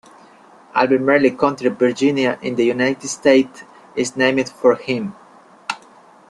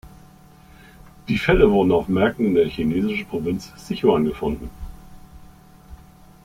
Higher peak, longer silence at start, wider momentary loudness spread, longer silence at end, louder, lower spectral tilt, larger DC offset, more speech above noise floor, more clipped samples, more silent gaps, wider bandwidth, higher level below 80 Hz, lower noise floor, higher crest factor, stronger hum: about the same, -2 dBFS vs -2 dBFS; first, 0.75 s vs 0.05 s; second, 14 LU vs 17 LU; about the same, 0.55 s vs 0.5 s; first, -17 LUFS vs -20 LUFS; second, -4.5 dB/octave vs -7 dB/octave; neither; about the same, 30 dB vs 28 dB; neither; neither; second, 11 kHz vs 16 kHz; second, -62 dBFS vs -38 dBFS; about the same, -47 dBFS vs -48 dBFS; about the same, 18 dB vs 20 dB; neither